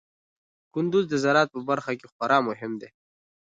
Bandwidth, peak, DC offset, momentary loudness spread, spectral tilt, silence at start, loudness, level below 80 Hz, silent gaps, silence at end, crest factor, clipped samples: 9.2 kHz; -8 dBFS; under 0.1%; 13 LU; -5.5 dB/octave; 0.75 s; -25 LUFS; -72 dBFS; 2.12-2.20 s; 0.65 s; 18 dB; under 0.1%